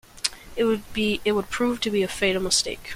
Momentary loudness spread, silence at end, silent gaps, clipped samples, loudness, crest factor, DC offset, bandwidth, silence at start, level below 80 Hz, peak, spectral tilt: 6 LU; 0 s; none; under 0.1%; -24 LUFS; 24 dB; under 0.1%; 16.5 kHz; 0.15 s; -46 dBFS; 0 dBFS; -3 dB/octave